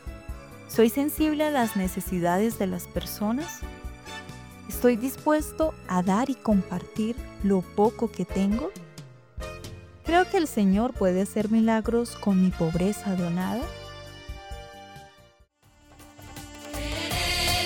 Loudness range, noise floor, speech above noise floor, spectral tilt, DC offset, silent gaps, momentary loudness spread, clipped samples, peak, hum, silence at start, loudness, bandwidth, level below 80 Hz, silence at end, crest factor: 9 LU; -59 dBFS; 34 dB; -5.5 dB/octave; under 0.1%; none; 19 LU; under 0.1%; -10 dBFS; none; 0.05 s; -26 LUFS; over 20 kHz; -42 dBFS; 0 s; 18 dB